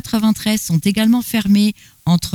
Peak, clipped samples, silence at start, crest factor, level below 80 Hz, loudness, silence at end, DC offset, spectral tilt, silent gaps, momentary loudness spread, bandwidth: -4 dBFS; under 0.1%; 0.05 s; 12 dB; -44 dBFS; -16 LUFS; 0 s; under 0.1%; -5 dB/octave; none; 4 LU; 19.5 kHz